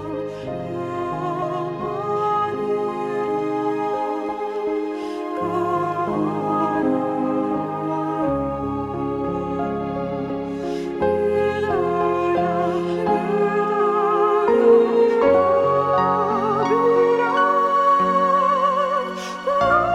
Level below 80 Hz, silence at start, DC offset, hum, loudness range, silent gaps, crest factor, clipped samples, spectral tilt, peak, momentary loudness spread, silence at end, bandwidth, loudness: -50 dBFS; 0 s; under 0.1%; none; 7 LU; none; 16 dB; under 0.1%; -7 dB/octave; -4 dBFS; 10 LU; 0 s; 11.5 kHz; -21 LUFS